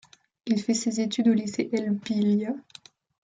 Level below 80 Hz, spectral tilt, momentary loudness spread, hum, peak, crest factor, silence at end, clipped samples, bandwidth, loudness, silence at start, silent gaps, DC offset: -72 dBFS; -5.5 dB/octave; 8 LU; none; -12 dBFS; 16 dB; 0.65 s; under 0.1%; 9.4 kHz; -26 LUFS; 0.45 s; none; under 0.1%